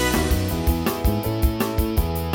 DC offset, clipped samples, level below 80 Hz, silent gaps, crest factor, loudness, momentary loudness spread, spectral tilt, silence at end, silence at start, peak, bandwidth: under 0.1%; under 0.1%; -26 dBFS; none; 14 dB; -23 LUFS; 2 LU; -5.5 dB/octave; 0 s; 0 s; -8 dBFS; 17.5 kHz